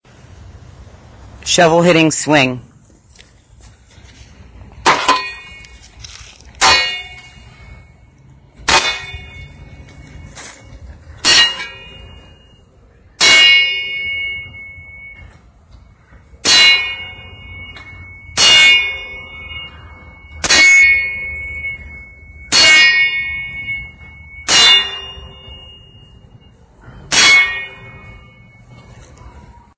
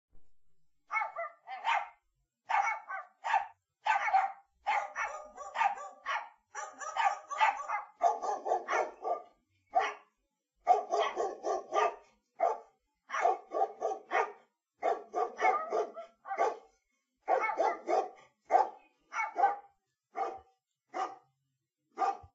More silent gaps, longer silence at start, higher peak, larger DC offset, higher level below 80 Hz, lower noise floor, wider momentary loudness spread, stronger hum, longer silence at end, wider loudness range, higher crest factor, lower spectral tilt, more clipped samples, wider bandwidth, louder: neither; first, 0.8 s vs 0.15 s; first, 0 dBFS vs -14 dBFS; neither; first, -42 dBFS vs -80 dBFS; second, -47 dBFS vs -84 dBFS; first, 27 LU vs 13 LU; neither; first, 0.4 s vs 0.1 s; first, 9 LU vs 2 LU; about the same, 16 dB vs 20 dB; first, -1.5 dB/octave vs 1 dB/octave; neither; about the same, 8 kHz vs 8 kHz; first, -10 LUFS vs -34 LUFS